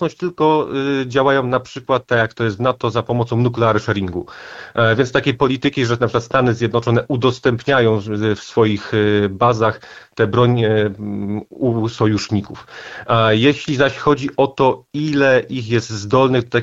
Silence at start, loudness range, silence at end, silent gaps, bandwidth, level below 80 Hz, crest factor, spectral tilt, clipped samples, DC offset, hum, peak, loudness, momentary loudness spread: 0 s; 2 LU; 0 s; none; 7.8 kHz; -50 dBFS; 16 dB; -6.5 dB/octave; under 0.1%; under 0.1%; none; -2 dBFS; -17 LUFS; 8 LU